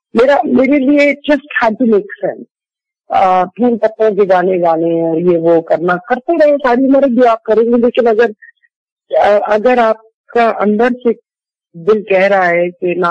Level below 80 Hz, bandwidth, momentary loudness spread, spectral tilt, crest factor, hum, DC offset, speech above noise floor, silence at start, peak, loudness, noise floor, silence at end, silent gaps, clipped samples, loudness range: -50 dBFS; 8 kHz; 6 LU; -7.5 dB/octave; 8 dB; none; under 0.1%; 75 dB; 0.15 s; -2 dBFS; -12 LUFS; -86 dBFS; 0 s; 2.51-2.55 s, 8.76-8.97 s, 10.14-10.24 s; under 0.1%; 2 LU